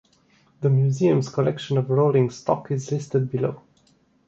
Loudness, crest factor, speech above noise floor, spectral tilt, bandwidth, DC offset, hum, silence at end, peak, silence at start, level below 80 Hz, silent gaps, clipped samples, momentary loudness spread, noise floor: -23 LUFS; 18 dB; 40 dB; -8 dB/octave; 7.8 kHz; under 0.1%; none; 0.7 s; -6 dBFS; 0.6 s; -62 dBFS; none; under 0.1%; 7 LU; -61 dBFS